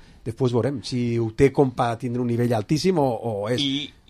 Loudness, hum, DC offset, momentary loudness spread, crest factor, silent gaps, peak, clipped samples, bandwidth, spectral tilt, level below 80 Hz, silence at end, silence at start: -23 LUFS; none; under 0.1%; 6 LU; 18 dB; none; -4 dBFS; under 0.1%; 13.5 kHz; -6.5 dB/octave; -48 dBFS; 0.2 s; 0.25 s